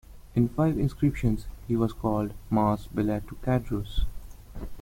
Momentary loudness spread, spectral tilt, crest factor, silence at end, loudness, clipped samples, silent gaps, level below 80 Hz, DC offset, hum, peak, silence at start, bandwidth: 9 LU; -8.5 dB/octave; 16 dB; 0 s; -28 LUFS; under 0.1%; none; -38 dBFS; under 0.1%; none; -10 dBFS; 0.1 s; 16.5 kHz